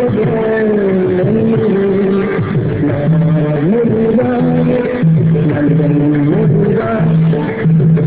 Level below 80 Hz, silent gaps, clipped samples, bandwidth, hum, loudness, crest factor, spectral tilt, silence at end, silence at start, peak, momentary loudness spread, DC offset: -38 dBFS; none; under 0.1%; 4 kHz; none; -12 LUFS; 10 dB; -13 dB/octave; 0 s; 0 s; -2 dBFS; 3 LU; 0.3%